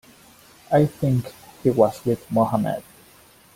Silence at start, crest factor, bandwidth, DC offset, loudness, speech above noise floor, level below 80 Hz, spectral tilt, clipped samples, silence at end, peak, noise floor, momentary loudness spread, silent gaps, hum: 0.7 s; 20 dB; 16.5 kHz; under 0.1%; -22 LUFS; 31 dB; -54 dBFS; -8 dB/octave; under 0.1%; 0.75 s; -2 dBFS; -52 dBFS; 8 LU; none; none